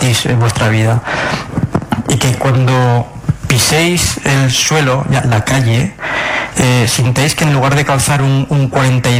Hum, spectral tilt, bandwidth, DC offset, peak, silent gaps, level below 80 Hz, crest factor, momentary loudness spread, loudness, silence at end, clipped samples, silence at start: none; -4.5 dB/octave; 16 kHz; under 0.1%; 0 dBFS; none; -34 dBFS; 12 dB; 6 LU; -12 LUFS; 0 s; under 0.1%; 0 s